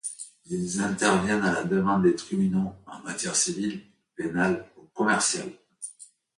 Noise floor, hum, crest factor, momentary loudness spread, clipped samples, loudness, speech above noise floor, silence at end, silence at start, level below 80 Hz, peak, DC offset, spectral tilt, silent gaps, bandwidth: -51 dBFS; none; 20 dB; 18 LU; under 0.1%; -26 LUFS; 26 dB; 0.3 s; 0.05 s; -58 dBFS; -8 dBFS; under 0.1%; -4 dB/octave; none; 11.5 kHz